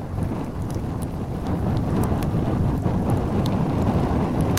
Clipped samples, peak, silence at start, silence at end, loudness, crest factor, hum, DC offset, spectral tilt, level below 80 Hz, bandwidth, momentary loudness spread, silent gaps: under 0.1%; -4 dBFS; 0 s; 0 s; -24 LUFS; 18 dB; none; under 0.1%; -8 dB/octave; -32 dBFS; 16 kHz; 7 LU; none